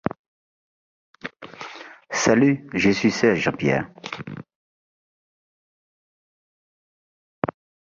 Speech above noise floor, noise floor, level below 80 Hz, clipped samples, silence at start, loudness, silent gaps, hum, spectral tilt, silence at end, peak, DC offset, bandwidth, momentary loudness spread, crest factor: 20 dB; -40 dBFS; -56 dBFS; under 0.1%; 1.25 s; -21 LUFS; 4.55-7.42 s; none; -5 dB/octave; 0.35 s; -4 dBFS; under 0.1%; 7.6 kHz; 19 LU; 22 dB